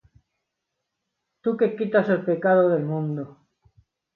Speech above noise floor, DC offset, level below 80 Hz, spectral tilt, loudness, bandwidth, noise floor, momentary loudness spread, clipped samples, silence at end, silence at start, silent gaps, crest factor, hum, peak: 59 dB; under 0.1%; -70 dBFS; -10 dB/octave; -23 LUFS; 4.5 kHz; -81 dBFS; 11 LU; under 0.1%; 0.85 s; 1.45 s; none; 18 dB; none; -6 dBFS